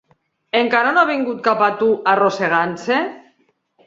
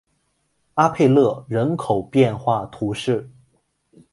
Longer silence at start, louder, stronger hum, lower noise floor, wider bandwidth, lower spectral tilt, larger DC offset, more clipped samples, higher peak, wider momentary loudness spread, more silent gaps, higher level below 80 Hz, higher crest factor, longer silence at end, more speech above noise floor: second, 0.55 s vs 0.75 s; first, -17 LUFS vs -20 LUFS; neither; second, -62 dBFS vs -68 dBFS; second, 7.8 kHz vs 11.5 kHz; second, -5 dB/octave vs -7.5 dB/octave; neither; neither; about the same, 0 dBFS vs -2 dBFS; second, 5 LU vs 10 LU; neither; second, -66 dBFS vs -54 dBFS; about the same, 18 dB vs 20 dB; second, 0.65 s vs 0.85 s; second, 45 dB vs 50 dB